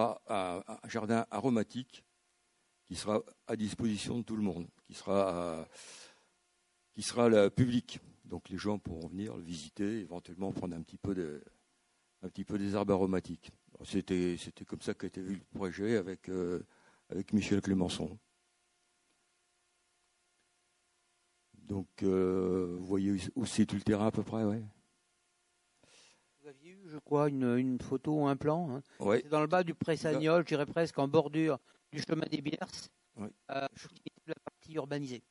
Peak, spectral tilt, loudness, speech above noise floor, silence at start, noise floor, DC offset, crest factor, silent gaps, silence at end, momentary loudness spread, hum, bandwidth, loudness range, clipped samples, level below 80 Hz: -12 dBFS; -6 dB/octave; -34 LUFS; 42 dB; 0 s; -76 dBFS; under 0.1%; 22 dB; none; 0.1 s; 17 LU; none; 11.5 kHz; 8 LU; under 0.1%; -62 dBFS